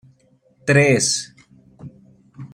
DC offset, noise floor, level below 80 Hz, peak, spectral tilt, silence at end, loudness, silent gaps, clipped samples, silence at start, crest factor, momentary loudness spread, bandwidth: under 0.1%; -58 dBFS; -58 dBFS; -2 dBFS; -4 dB/octave; 0.1 s; -17 LUFS; none; under 0.1%; 0.65 s; 20 dB; 24 LU; 15 kHz